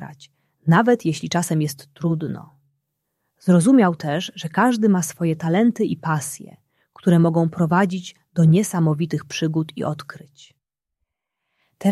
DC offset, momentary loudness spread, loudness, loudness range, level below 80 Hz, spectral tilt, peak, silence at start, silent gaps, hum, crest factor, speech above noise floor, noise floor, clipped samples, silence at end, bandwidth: under 0.1%; 12 LU; -20 LUFS; 4 LU; -62 dBFS; -6.5 dB/octave; -2 dBFS; 0 s; none; none; 18 dB; 60 dB; -80 dBFS; under 0.1%; 0 s; 13.5 kHz